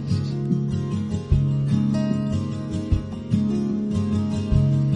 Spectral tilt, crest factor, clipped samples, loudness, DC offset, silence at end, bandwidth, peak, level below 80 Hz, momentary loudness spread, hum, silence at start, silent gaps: -8.5 dB/octave; 16 dB; under 0.1%; -23 LUFS; under 0.1%; 0 s; 9.4 kHz; -6 dBFS; -34 dBFS; 5 LU; none; 0 s; none